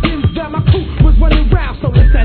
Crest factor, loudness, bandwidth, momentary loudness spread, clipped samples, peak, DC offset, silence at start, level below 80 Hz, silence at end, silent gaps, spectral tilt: 10 dB; -13 LUFS; 4.5 kHz; 5 LU; 0.4%; 0 dBFS; under 0.1%; 0 s; -12 dBFS; 0 s; none; -10.5 dB/octave